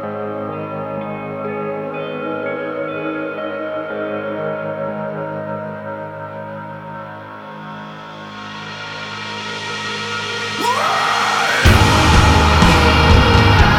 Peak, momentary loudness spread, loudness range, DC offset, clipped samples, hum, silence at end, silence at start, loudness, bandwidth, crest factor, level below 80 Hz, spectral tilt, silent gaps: 0 dBFS; 19 LU; 16 LU; under 0.1%; under 0.1%; none; 0 s; 0 s; -17 LUFS; 16 kHz; 18 dB; -24 dBFS; -5 dB/octave; none